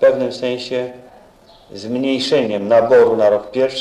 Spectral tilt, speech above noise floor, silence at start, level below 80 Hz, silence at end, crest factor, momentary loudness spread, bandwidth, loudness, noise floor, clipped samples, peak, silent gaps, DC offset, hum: -5 dB/octave; 31 dB; 0 s; -56 dBFS; 0 s; 14 dB; 13 LU; 10.5 kHz; -16 LUFS; -46 dBFS; under 0.1%; -2 dBFS; none; under 0.1%; none